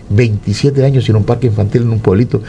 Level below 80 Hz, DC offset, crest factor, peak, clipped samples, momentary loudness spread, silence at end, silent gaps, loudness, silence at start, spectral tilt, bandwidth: -36 dBFS; under 0.1%; 12 dB; 0 dBFS; 0.1%; 3 LU; 0 s; none; -12 LUFS; 0 s; -8 dB/octave; 10 kHz